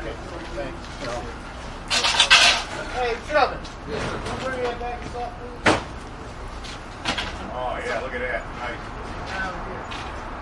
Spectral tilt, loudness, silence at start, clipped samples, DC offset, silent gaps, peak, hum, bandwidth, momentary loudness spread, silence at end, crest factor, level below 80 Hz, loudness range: -2.5 dB/octave; -23 LUFS; 0 s; under 0.1%; under 0.1%; none; 0 dBFS; none; 11.5 kHz; 18 LU; 0 s; 24 dB; -38 dBFS; 10 LU